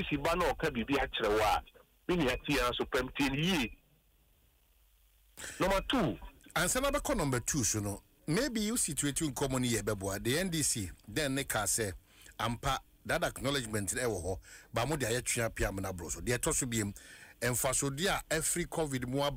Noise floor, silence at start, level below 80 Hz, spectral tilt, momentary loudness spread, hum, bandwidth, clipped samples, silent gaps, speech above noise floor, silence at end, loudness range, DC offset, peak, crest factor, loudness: -68 dBFS; 0 s; -48 dBFS; -3.5 dB/octave; 8 LU; none; 16 kHz; under 0.1%; none; 35 dB; 0 s; 3 LU; under 0.1%; -18 dBFS; 16 dB; -33 LUFS